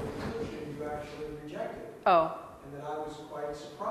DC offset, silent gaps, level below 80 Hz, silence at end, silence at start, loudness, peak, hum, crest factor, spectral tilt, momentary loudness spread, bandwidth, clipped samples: under 0.1%; none; -58 dBFS; 0 s; 0 s; -34 LUFS; -12 dBFS; none; 22 dB; -6 dB/octave; 15 LU; 13.5 kHz; under 0.1%